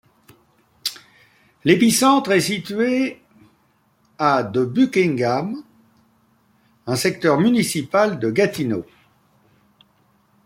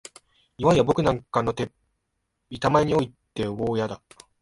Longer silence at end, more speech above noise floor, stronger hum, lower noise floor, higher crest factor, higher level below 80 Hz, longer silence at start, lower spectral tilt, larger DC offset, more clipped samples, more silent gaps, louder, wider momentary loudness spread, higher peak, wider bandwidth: first, 1.65 s vs 0.45 s; second, 43 dB vs 54 dB; neither; second, -61 dBFS vs -77 dBFS; about the same, 20 dB vs 20 dB; second, -62 dBFS vs -50 dBFS; first, 0.85 s vs 0.6 s; second, -4.5 dB/octave vs -6.5 dB/octave; neither; neither; neither; first, -19 LUFS vs -24 LUFS; about the same, 13 LU vs 12 LU; first, -2 dBFS vs -6 dBFS; first, 16.5 kHz vs 11.5 kHz